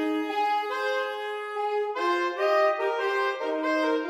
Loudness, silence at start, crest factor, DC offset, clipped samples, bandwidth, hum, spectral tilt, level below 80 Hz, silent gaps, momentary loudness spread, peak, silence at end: -27 LUFS; 0 s; 14 dB; under 0.1%; under 0.1%; 15.5 kHz; none; -2 dB/octave; -84 dBFS; none; 7 LU; -14 dBFS; 0 s